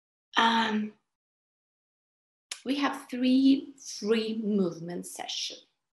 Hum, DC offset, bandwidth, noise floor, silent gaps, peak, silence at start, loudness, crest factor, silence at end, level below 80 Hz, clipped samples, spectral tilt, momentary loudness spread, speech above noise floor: none; under 0.1%; 12.5 kHz; under -90 dBFS; 1.15-2.50 s; -8 dBFS; 0.35 s; -28 LUFS; 22 dB; 0.35 s; -80 dBFS; under 0.1%; -4 dB/octave; 15 LU; over 62 dB